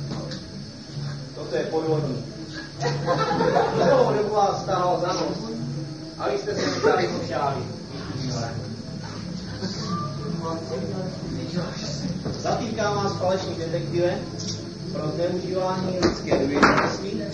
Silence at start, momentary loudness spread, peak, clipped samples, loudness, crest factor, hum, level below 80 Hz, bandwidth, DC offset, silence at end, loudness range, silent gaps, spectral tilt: 0 s; 12 LU; -2 dBFS; under 0.1%; -25 LUFS; 22 dB; none; -48 dBFS; 10 kHz; 0.2%; 0 s; 7 LU; none; -5.5 dB/octave